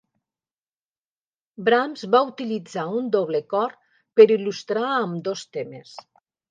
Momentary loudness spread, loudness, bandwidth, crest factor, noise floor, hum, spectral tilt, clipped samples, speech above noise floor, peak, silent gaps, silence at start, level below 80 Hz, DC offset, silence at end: 14 LU; -22 LUFS; 7.6 kHz; 22 dB; under -90 dBFS; none; -5.5 dB/octave; under 0.1%; over 68 dB; -2 dBFS; none; 1.6 s; -80 dBFS; under 0.1%; 0.5 s